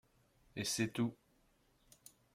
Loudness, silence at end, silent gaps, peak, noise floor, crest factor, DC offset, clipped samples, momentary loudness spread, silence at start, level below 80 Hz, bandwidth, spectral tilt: -39 LUFS; 1.2 s; none; -24 dBFS; -73 dBFS; 20 dB; under 0.1%; under 0.1%; 24 LU; 0.55 s; -74 dBFS; 16.5 kHz; -4 dB/octave